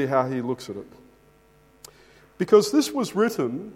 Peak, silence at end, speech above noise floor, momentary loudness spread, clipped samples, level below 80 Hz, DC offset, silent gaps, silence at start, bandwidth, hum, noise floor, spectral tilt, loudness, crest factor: -4 dBFS; 0 s; 34 dB; 15 LU; under 0.1%; -64 dBFS; under 0.1%; none; 0 s; 16 kHz; none; -57 dBFS; -5 dB/octave; -23 LUFS; 22 dB